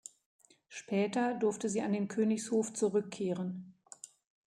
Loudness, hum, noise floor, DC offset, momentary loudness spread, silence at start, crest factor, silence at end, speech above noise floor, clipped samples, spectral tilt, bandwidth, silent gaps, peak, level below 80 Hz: -34 LUFS; none; -55 dBFS; under 0.1%; 19 LU; 0.7 s; 16 dB; 0.4 s; 22 dB; under 0.1%; -5.5 dB/octave; 11.5 kHz; none; -18 dBFS; -80 dBFS